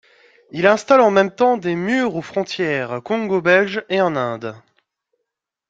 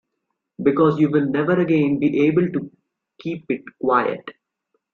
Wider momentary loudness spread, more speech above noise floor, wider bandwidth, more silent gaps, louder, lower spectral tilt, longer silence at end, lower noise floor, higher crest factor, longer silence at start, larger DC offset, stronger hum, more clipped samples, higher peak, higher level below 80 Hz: second, 11 LU vs 14 LU; first, 62 dB vs 58 dB; first, 7.8 kHz vs 6.4 kHz; neither; about the same, -18 LUFS vs -20 LUFS; second, -5.5 dB/octave vs -9.5 dB/octave; first, 1.1 s vs 0.65 s; about the same, -79 dBFS vs -77 dBFS; about the same, 18 dB vs 16 dB; about the same, 0.55 s vs 0.6 s; neither; neither; neither; about the same, -2 dBFS vs -4 dBFS; about the same, -64 dBFS vs -62 dBFS